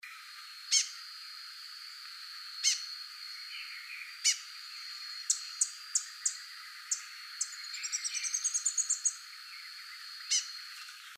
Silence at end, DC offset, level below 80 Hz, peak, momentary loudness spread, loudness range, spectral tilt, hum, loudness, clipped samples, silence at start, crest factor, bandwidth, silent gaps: 0 s; under 0.1%; under -90 dBFS; -14 dBFS; 15 LU; 2 LU; 10 dB/octave; none; -34 LUFS; under 0.1%; 0.05 s; 24 dB; 15.5 kHz; none